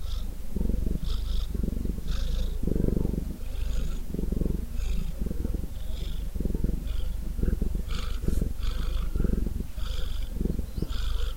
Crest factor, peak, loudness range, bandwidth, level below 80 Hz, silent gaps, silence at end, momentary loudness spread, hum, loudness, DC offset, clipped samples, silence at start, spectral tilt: 16 dB; -12 dBFS; 2 LU; 16 kHz; -28 dBFS; none; 0 s; 6 LU; none; -33 LUFS; under 0.1%; under 0.1%; 0 s; -7 dB/octave